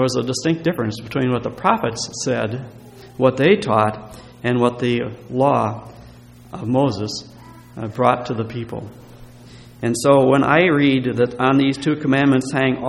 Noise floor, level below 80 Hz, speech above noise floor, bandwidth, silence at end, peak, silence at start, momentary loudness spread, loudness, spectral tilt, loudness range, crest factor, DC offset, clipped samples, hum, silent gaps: -42 dBFS; -52 dBFS; 24 dB; 13.5 kHz; 0 s; 0 dBFS; 0 s; 16 LU; -18 LUFS; -6 dB/octave; 7 LU; 20 dB; under 0.1%; under 0.1%; none; none